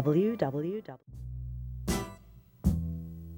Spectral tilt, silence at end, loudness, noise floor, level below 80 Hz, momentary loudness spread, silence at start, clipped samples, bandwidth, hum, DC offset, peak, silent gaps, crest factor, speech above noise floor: -7 dB/octave; 0 s; -33 LUFS; -55 dBFS; -42 dBFS; 16 LU; 0 s; under 0.1%; 18 kHz; none; under 0.1%; -14 dBFS; none; 18 dB; 24 dB